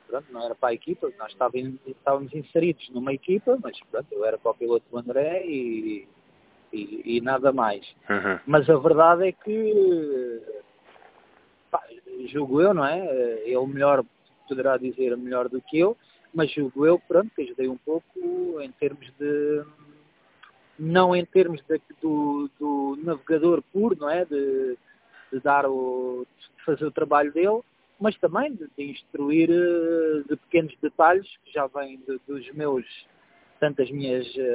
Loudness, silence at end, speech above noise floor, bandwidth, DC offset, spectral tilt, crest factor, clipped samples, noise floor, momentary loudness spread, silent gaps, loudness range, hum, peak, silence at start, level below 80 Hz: -24 LUFS; 0 s; 35 dB; 4 kHz; under 0.1%; -10.5 dB/octave; 22 dB; under 0.1%; -59 dBFS; 14 LU; none; 6 LU; none; -2 dBFS; 0.1 s; -66 dBFS